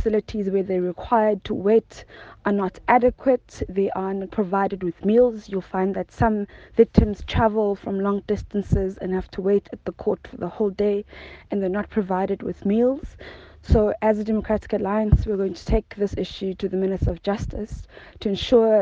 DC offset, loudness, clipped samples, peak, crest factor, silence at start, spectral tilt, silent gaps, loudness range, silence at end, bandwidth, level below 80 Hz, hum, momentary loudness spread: under 0.1%; -23 LUFS; under 0.1%; 0 dBFS; 22 dB; 0 s; -8 dB/octave; none; 3 LU; 0 s; 7.6 kHz; -34 dBFS; none; 11 LU